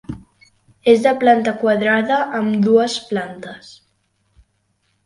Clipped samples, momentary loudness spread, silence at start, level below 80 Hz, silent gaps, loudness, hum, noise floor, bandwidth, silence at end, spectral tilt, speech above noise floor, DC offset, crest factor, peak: under 0.1%; 21 LU; 0.1 s; -54 dBFS; none; -16 LUFS; none; -66 dBFS; 11.5 kHz; 1.35 s; -5.5 dB/octave; 50 dB; under 0.1%; 18 dB; 0 dBFS